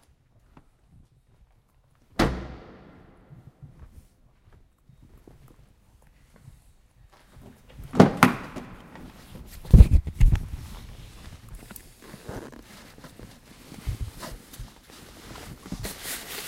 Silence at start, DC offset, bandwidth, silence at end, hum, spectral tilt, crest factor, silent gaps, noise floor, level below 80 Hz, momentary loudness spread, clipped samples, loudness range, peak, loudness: 2.2 s; under 0.1%; 16 kHz; 0 s; none; -6.5 dB/octave; 28 dB; none; -62 dBFS; -30 dBFS; 28 LU; under 0.1%; 19 LU; 0 dBFS; -23 LUFS